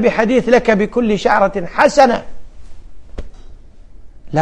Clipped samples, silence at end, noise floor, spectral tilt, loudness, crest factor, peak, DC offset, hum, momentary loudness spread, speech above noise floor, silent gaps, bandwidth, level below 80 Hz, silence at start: under 0.1%; 0 s; -36 dBFS; -5.5 dB/octave; -14 LUFS; 16 dB; 0 dBFS; under 0.1%; none; 18 LU; 23 dB; none; 10.5 kHz; -36 dBFS; 0 s